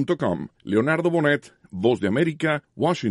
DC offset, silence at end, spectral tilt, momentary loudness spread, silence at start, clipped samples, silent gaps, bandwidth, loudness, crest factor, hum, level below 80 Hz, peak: under 0.1%; 0 s; -7 dB/octave; 6 LU; 0 s; under 0.1%; none; 11.5 kHz; -23 LUFS; 16 dB; none; -60 dBFS; -6 dBFS